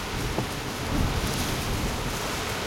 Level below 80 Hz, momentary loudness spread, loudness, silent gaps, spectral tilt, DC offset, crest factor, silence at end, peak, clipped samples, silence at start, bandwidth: -36 dBFS; 3 LU; -28 LUFS; none; -4 dB/octave; under 0.1%; 16 dB; 0 s; -12 dBFS; under 0.1%; 0 s; 16.5 kHz